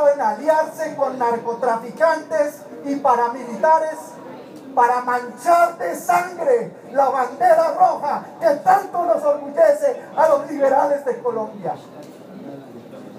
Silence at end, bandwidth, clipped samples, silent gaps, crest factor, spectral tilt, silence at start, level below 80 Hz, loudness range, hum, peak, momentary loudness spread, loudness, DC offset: 0 s; 15.5 kHz; under 0.1%; none; 16 dB; -5 dB/octave; 0 s; -78 dBFS; 3 LU; none; -2 dBFS; 20 LU; -19 LUFS; under 0.1%